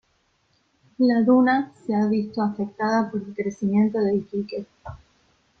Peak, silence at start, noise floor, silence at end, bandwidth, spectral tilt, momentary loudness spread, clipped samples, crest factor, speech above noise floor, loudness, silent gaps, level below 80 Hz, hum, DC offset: -8 dBFS; 1 s; -67 dBFS; 0.65 s; 6.6 kHz; -7.5 dB/octave; 15 LU; under 0.1%; 16 dB; 45 dB; -23 LUFS; none; -60 dBFS; none; under 0.1%